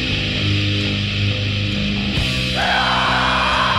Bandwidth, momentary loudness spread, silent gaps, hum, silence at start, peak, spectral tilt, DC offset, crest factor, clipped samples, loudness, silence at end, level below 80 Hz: 12.5 kHz; 4 LU; none; none; 0 s; -6 dBFS; -4.5 dB/octave; under 0.1%; 14 dB; under 0.1%; -18 LUFS; 0 s; -32 dBFS